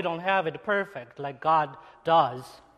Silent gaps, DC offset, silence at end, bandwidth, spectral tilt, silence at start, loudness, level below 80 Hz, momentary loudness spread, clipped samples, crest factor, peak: none; under 0.1%; 0.2 s; 13 kHz; -6 dB/octave; 0 s; -26 LUFS; -68 dBFS; 14 LU; under 0.1%; 18 dB; -10 dBFS